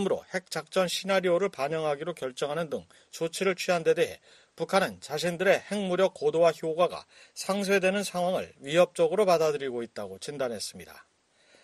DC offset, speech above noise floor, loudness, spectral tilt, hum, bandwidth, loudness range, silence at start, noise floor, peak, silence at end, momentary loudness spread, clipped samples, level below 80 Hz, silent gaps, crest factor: under 0.1%; 35 dB; -28 LUFS; -4.5 dB/octave; none; 13 kHz; 3 LU; 0 s; -63 dBFS; -10 dBFS; 0.6 s; 13 LU; under 0.1%; -72 dBFS; none; 20 dB